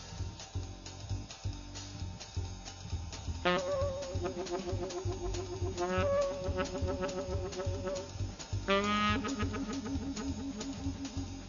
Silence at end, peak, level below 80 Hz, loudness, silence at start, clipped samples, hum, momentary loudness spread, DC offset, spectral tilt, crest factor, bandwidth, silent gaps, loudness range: 0 s; -14 dBFS; -46 dBFS; -37 LUFS; 0 s; under 0.1%; none; 12 LU; under 0.1%; -4.5 dB/octave; 22 dB; 7.2 kHz; none; 4 LU